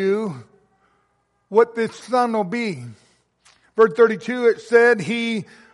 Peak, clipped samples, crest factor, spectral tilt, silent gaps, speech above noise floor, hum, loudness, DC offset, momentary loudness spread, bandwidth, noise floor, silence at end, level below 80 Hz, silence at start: -2 dBFS; under 0.1%; 18 dB; -5.5 dB/octave; none; 48 dB; none; -19 LUFS; under 0.1%; 15 LU; 11.5 kHz; -67 dBFS; 0.3 s; -70 dBFS; 0 s